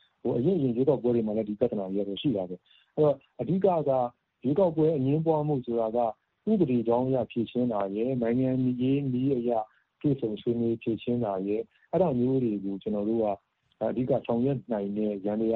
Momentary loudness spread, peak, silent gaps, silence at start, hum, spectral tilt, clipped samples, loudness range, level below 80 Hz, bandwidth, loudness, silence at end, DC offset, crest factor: 7 LU; -10 dBFS; none; 0.25 s; none; -11 dB/octave; under 0.1%; 2 LU; -64 dBFS; 4.2 kHz; -28 LUFS; 0 s; under 0.1%; 16 dB